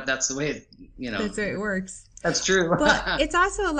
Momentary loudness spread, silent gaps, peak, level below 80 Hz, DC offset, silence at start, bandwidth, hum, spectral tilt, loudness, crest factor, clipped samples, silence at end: 11 LU; none; -4 dBFS; -42 dBFS; under 0.1%; 0 s; 10 kHz; none; -3 dB/octave; -24 LUFS; 20 dB; under 0.1%; 0 s